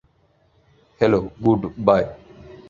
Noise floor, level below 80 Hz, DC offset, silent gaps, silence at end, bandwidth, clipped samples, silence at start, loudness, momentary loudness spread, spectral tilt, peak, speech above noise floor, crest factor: -61 dBFS; -48 dBFS; under 0.1%; none; 0.15 s; 7.2 kHz; under 0.1%; 1 s; -20 LUFS; 3 LU; -8.5 dB/octave; -2 dBFS; 42 dB; 20 dB